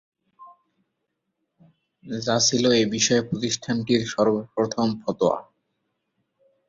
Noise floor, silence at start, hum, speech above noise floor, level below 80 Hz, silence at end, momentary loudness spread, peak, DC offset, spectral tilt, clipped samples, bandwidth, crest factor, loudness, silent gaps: -78 dBFS; 0.4 s; none; 56 dB; -62 dBFS; 1.25 s; 7 LU; -6 dBFS; under 0.1%; -3.5 dB/octave; under 0.1%; 7.8 kHz; 18 dB; -22 LUFS; none